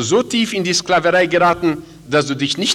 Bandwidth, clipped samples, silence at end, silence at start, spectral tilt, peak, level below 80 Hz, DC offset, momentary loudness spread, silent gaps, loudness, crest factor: 16 kHz; under 0.1%; 0 s; 0 s; -3.5 dB/octave; -4 dBFS; -50 dBFS; under 0.1%; 6 LU; none; -16 LUFS; 12 dB